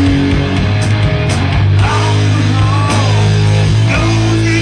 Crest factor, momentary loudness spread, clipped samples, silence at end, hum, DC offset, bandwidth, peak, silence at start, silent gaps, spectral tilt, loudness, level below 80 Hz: 8 dB; 2 LU; under 0.1%; 0 s; none; under 0.1%; 10 kHz; -2 dBFS; 0 s; none; -6 dB/octave; -11 LUFS; -24 dBFS